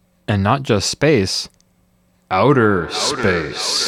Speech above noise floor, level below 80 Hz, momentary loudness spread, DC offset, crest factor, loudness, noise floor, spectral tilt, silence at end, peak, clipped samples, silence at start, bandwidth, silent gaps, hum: 42 dB; -48 dBFS; 8 LU; under 0.1%; 16 dB; -17 LUFS; -58 dBFS; -4.5 dB/octave; 0 s; -2 dBFS; under 0.1%; 0.3 s; 16 kHz; none; none